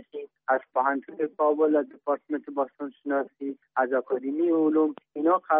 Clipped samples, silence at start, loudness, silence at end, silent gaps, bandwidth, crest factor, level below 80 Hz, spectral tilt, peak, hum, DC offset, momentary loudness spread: under 0.1%; 0.15 s; -27 LUFS; 0 s; none; 3.7 kHz; 16 dB; -82 dBFS; -5 dB/octave; -10 dBFS; none; under 0.1%; 10 LU